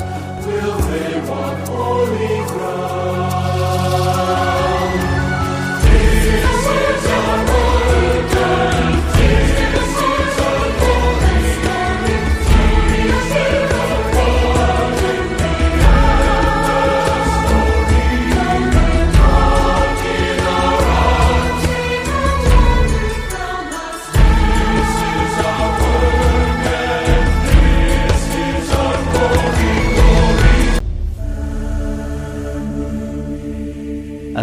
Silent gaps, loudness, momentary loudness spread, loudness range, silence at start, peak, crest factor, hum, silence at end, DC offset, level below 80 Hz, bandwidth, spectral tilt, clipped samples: none; -16 LUFS; 10 LU; 3 LU; 0 s; 0 dBFS; 14 dB; none; 0 s; under 0.1%; -18 dBFS; 15.5 kHz; -5.5 dB/octave; under 0.1%